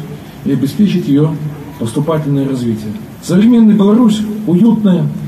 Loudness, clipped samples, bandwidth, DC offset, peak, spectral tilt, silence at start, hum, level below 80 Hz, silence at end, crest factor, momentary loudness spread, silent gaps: -12 LUFS; under 0.1%; 13.5 kHz; under 0.1%; 0 dBFS; -8 dB/octave; 0 s; none; -46 dBFS; 0 s; 10 dB; 14 LU; none